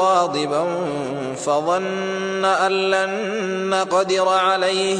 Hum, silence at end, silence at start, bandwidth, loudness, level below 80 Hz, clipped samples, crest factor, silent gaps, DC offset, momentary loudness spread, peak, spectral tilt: none; 0 s; 0 s; 10.5 kHz; -20 LUFS; -66 dBFS; under 0.1%; 16 dB; none; under 0.1%; 7 LU; -4 dBFS; -3.5 dB/octave